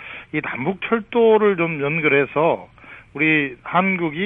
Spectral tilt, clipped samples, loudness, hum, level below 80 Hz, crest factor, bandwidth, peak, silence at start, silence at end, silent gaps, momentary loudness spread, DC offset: -9 dB/octave; under 0.1%; -19 LUFS; none; -58 dBFS; 16 dB; 3.8 kHz; -4 dBFS; 0 s; 0 s; none; 10 LU; under 0.1%